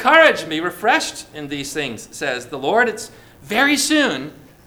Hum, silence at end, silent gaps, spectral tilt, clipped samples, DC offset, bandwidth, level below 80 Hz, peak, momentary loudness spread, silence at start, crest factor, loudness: none; 0.35 s; none; -2.5 dB/octave; under 0.1%; under 0.1%; over 20 kHz; -54 dBFS; 0 dBFS; 14 LU; 0 s; 18 dB; -18 LUFS